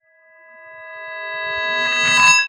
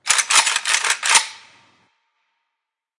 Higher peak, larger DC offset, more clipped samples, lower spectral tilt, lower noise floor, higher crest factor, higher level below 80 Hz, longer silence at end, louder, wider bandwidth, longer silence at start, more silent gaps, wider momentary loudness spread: about the same, 0 dBFS vs 0 dBFS; neither; neither; first, 0.5 dB/octave vs 4 dB/octave; second, -50 dBFS vs -81 dBFS; about the same, 18 dB vs 22 dB; first, -62 dBFS vs -70 dBFS; second, 0 s vs 1.65 s; about the same, -16 LUFS vs -15 LUFS; first, over 20 kHz vs 11.5 kHz; first, 0.55 s vs 0.05 s; neither; first, 23 LU vs 4 LU